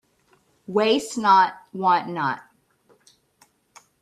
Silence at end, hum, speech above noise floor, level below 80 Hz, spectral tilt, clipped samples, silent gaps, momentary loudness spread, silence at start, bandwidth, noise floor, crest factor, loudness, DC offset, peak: 1.6 s; none; 42 dB; -72 dBFS; -4 dB/octave; under 0.1%; none; 10 LU; 0.7 s; 13 kHz; -63 dBFS; 20 dB; -21 LUFS; under 0.1%; -4 dBFS